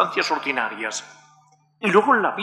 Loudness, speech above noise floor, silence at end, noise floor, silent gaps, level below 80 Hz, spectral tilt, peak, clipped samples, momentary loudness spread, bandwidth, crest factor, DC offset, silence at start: -21 LUFS; 36 dB; 0 s; -58 dBFS; none; -78 dBFS; -3.5 dB/octave; -4 dBFS; under 0.1%; 12 LU; 12 kHz; 18 dB; under 0.1%; 0 s